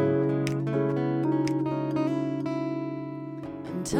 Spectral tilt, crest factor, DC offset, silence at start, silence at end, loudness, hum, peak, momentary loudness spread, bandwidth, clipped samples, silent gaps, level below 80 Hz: -7 dB/octave; 16 dB; under 0.1%; 0 s; 0 s; -28 LUFS; none; -12 dBFS; 10 LU; 14 kHz; under 0.1%; none; -62 dBFS